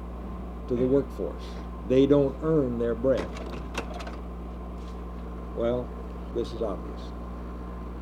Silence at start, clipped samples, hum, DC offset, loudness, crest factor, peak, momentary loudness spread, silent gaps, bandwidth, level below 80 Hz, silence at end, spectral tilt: 0 s; under 0.1%; none; under 0.1%; -29 LUFS; 20 dB; -8 dBFS; 15 LU; none; 11.5 kHz; -38 dBFS; 0 s; -8 dB/octave